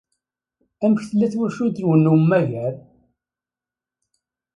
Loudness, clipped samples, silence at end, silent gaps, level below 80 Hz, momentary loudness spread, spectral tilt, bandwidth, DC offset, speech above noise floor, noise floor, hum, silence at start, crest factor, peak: -19 LUFS; under 0.1%; 1.8 s; none; -64 dBFS; 11 LU; -9 dB/octave; 9.8 kHz; under 0.1%; 72 dB; -90 dBFS; none; 0.8 s; 18 dB; -4 dBFS